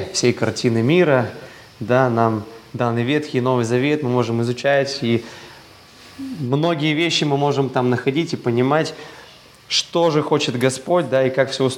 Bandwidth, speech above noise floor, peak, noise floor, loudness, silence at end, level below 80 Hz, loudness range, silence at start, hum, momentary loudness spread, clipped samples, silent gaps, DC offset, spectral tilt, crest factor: 15.5 kHz; 26 dB; 0 dBFS; -44 dBFS; -19 LUFS; 0 s; -62 dBFS; 2 LU; 0 s; none; 11 LU; under 0.1%; none; under 0.1%; -5.5 dB/octave; 18 dB